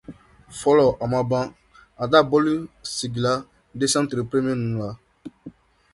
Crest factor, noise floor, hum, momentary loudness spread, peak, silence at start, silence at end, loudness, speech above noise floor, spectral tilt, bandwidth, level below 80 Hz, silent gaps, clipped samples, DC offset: 22 dB; -45 dBFS; none; 18 LU; -2 dBFS; 0.1 s; 0.45 s; -22 LUFS; 24 dB; -5 dB/octave; 11.5 kHz; -54 dBFS; none; under 0.1%; under 0.1%